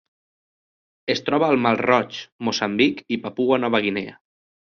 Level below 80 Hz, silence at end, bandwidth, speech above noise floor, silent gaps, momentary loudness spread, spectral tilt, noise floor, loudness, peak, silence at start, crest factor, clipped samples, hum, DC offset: -64 dBFS; 0.55 s; 7.2 kHz; over 69 dB; 2.32-2.39 s; 11 LU; -3 dB/octave; under -90 dBFS; -21 LUFS; -4 dBFS; 1.05 s; 20 dB; under 0.1%; none; under 0.1%